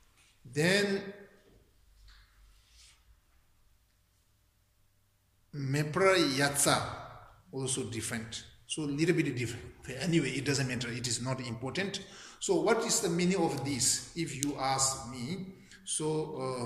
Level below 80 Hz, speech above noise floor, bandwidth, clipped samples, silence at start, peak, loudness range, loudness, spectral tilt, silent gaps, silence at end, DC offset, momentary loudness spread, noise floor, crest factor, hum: -62 dBFS; 39 dB; 15.5 kHz; under 0.1%; 0.45 s; -8 dBFS; 5 LU; -31 LUFS; -3.5 dB/octave; none; 0 s; under 0.1%; 15 LU; -70 dBFS; 26 dB; none